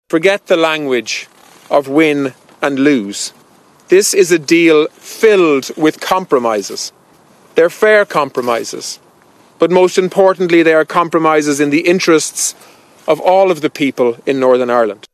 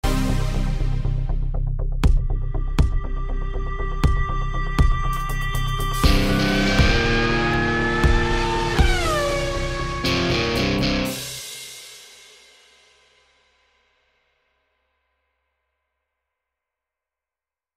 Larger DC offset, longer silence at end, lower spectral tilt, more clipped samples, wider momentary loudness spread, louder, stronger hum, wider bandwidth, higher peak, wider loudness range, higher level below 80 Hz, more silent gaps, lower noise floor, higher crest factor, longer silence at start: neither; second, 0.2 s vs 5.7 s; about the same, -4 dB/octave vs -5 dB/octave; neither; about the same, 11 LU vs 11 LU; first, -12 LUFS vs -22 LUFS; neither; about the same, 15 kHz vs 16 kHz; about the same, 0 dBFS vs -2 dBFS; second, 3 LU vs 7 LU; second, -64 dBFS vs -24 dBFS; neither; second, -47 dBFS vs under -90 dBFS; second, 12 dB vs 18 dB; about the same, 0.1 s vs 0.05 s